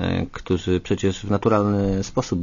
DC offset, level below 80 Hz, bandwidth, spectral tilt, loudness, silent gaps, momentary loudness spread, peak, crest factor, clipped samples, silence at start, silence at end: under 0.1%; -40 dBFS; 7.4 kHz; -6.5 dB/octave; -22 LUFS; none; 6 LU; -6 dBFS; 16 dB; under 0.1%; 0 s; 0 s